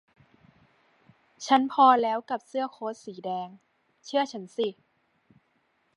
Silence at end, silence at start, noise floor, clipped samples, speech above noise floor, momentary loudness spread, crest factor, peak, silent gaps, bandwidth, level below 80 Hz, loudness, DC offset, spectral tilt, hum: 1.25 s; 1.4 s; -71 dBFS; under 0.1%; 45 dB; 17 LU; 22 dB; -6 dBFS; none; 11 kHz; -82 dBFS; -26 LUFS; under 0.1%; -4 dB/octave; none